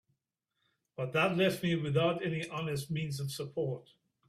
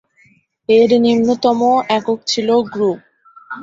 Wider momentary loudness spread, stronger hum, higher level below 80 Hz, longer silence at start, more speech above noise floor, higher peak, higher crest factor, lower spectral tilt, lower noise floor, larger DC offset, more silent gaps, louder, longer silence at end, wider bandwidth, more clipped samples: about the same, 9 LU vs 11 LU; neither; second, -68 dBFS vs -58 dBFS; first, 1 s vs 0.7 s; first, 51 dB vs 40 dB; second, -14 dBFS vs -2 dBFS; first, 20 dB vs 14 dB; about the same, -6 dB/octave vs -5 dB/octave; first, -84 dBFS vs -54 dBFS; neither; neither; second, -33 LUFS vs -15 LUFS; first, 0.5 s vs 0 s; first, 15 kHz vs 7.8 kHz; neither